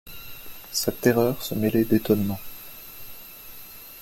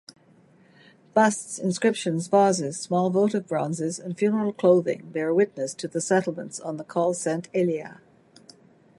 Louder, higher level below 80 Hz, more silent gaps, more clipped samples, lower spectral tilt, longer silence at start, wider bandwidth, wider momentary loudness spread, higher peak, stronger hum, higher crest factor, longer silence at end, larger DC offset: about the same, -24 LUFS vs -25 LUFS; first, -52 dBFS vs -74 dBFS; neither; neither; about the same, -5.5 dB/octave vs -5.5 dB/octave; second, 0.05 s vs 1.15 s; first, 17 kHz vs 11.5 kHz; first, 19 LU vs 10 LU; about the same, -4 dBFS vs -6 dBFS; neither; about the same, 22 dB vs 20 dB; second, 0 s vs 1.05 s; neither